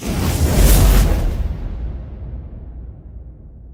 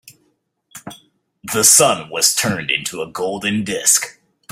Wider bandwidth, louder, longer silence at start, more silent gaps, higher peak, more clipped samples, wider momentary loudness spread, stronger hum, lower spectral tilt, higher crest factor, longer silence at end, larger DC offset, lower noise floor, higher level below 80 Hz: about the same, 17.5 kHz vs 17 kHz; about the same, -17 LUFS vs -15 LUFS; about the same, 0 s vs 0.05 s; neither; about the same, -2 dBFS vs 0 dBFS; neither; first, 24 LU vs 20 LU; neither; first, -5 dB/octave vs -1.5 dB/octave; about the same, 16 dB vs 20 dB; second, 0 s vs 0.4 s; neither; second, -37 dBFS vs -65 dBFS; first, -18 dBFS vs -58 dBFS